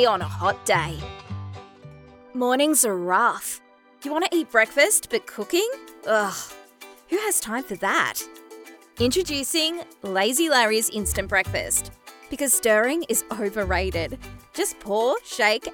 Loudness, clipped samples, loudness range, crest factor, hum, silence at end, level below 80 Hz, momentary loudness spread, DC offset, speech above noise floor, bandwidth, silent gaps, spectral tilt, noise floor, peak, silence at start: -22 LUFS; under 0.1%; 4 LU; 20 dB; none; 0 s; -44 dBFS; 17 LU; under 0.1%; 24 dB; over 20 kHz; none; -2.5 dB/octave; -47 dBFS; -4 dBFS; 0 s